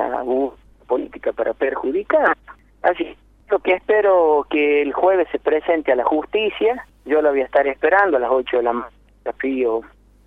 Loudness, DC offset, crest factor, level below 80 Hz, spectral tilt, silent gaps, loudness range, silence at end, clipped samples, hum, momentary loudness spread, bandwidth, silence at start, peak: -19 LUFS; under 0.1%; 16 dB; -52 dBFS; -6.5 dB/octave; none; 4 LU; 0.4 s; under 0.1%; none; 10 LU; 4.6 kHz; 0 s; -2 dBFS